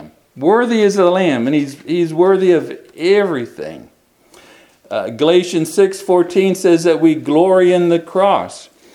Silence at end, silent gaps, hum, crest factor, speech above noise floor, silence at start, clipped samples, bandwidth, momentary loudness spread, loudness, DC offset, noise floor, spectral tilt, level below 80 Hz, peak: 0.3 s; none; none; 14 dB; 35 dB; 0 s; under 0.1%; 12.5 kHz; 11 LU; -14 LUFS; under 0.1%; -48 dBFS; -5.5 dB/octave; -64 dBFS; 0 dBFS